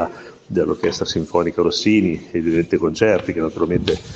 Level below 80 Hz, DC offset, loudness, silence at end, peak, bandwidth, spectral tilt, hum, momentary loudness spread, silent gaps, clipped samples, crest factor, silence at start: -44 dBFS; under 0.1%; -19 LUFS; 0 s; -2 dBFS; 8 kHz; -5.5 dB/octave; none; 6 LU; none; under 0.1%; 18 dB; 0 s